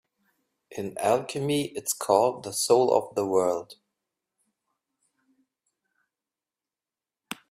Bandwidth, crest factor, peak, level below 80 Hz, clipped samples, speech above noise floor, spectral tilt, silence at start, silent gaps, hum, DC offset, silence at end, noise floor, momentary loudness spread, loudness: 16 kHz; 24 dB; -6 dBFS; -72 dBFS; under 0.1%; over 65 dB; -4 dB/octave; 0.7 s; none; none; under 0.1%; 0.15 s; under -90 dBFS; 15 LU; -25 LUFS